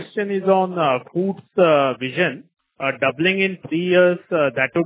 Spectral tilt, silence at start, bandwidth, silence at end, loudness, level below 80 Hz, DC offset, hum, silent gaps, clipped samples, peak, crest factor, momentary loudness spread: -9.5 dB/octave; 0 s; 4 kHz; 0 s; -19 LUFS; -66 dBFS; under 0.1%; none; none; under 0.1%; -2 dBFS; 16 dB; 8 LU